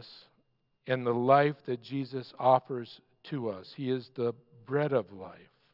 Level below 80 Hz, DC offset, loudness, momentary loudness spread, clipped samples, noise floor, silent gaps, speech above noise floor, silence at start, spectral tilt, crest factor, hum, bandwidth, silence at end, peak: -84 dBFS; under 0.1%; -31 LUFS; 23 LU; under 0.1%; -73 dBFS; none; 43 dB; 0 s; -9 dB/octave; 22 dB; none; 5.8 kHz; 0.4 s; -10 dBFS